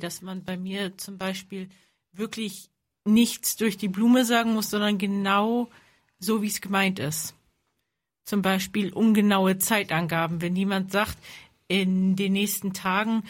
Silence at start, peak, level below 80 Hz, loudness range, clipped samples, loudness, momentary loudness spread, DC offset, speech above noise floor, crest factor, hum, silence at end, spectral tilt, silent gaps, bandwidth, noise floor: 0 s; -8 dBFS; -62 dBFS; 5 LU; under 0.1%; -25 LUFS; 14 LU; under 0.1%; 55 dB; 18 dB; none; 0 s; -4.5 dB/octave; none; 16.5 kHz; -80 dBFS